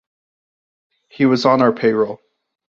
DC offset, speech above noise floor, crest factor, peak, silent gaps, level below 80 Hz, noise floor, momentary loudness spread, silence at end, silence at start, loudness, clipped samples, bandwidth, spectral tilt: under 0.1%; over 75 dB; 18 dB; -2 dBFS; none; -62 dBFS; under -90 dBFS; 9 LU; 0.55 s; 1.2 s; -16 LUFS; under 0.1%; 7.4 kHz; -6.5 dB/octave